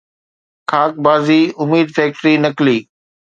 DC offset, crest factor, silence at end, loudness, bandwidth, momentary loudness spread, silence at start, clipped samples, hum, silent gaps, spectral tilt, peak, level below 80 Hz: under 0.1%; 14 dB; 0.55 s; -14 LUFS; 7.6 kHz; 6 LU; 0.7 s; under 0.1%; none; none; -6.5 dB/octave; 0 dBFS; -62 dBFS